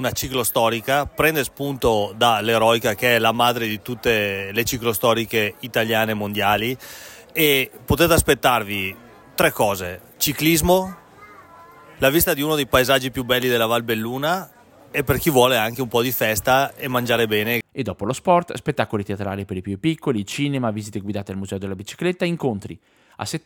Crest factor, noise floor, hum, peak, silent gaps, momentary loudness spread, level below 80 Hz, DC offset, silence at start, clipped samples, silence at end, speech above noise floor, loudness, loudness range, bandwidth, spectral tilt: 20 dB; -45 dBFS; none; -2 dBFS; none; 12 LU; -44 dBFS; under 0.1%; 0 s; under 0.1%; 0.05 s; 25 dB; -20 LUFS; 5 LU; 17 kHz; -4 dB/octave